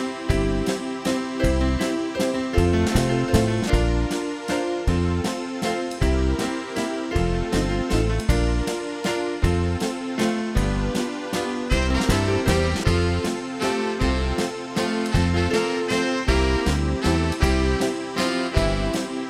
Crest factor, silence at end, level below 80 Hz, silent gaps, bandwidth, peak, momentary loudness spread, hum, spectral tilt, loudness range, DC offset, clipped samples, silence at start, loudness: 18 dB; 0 s; -28 dBFS; none; 15.5 kHz; -4 dBFS; 5 LU; none; -5.5 dB/octave; 2 LU; under 0.1%; under 0.1%; 0 s; -23 LUFS